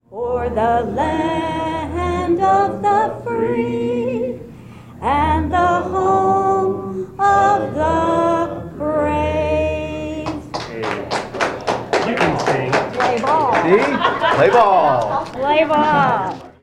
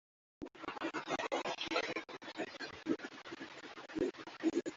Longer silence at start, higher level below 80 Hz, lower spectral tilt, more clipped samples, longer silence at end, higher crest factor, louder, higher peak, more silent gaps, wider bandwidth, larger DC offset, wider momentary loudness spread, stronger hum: second, 0.1 s vs 0.4 s; first, -38 dBFS vs -74 dBFS; first, -6 dB/octave vs -2 dB/octave; neither; first, 0.15 s vs 0 s; about the same, 16 dB vs 20 dB; first, -17 LUFS vs -41 LUFS; first, -2 dBFS vs -22 dBFS; neither; first, 12.5 kHz vs 7.8 kHz; neither; about the same, 10 LU vs 11 LU; neither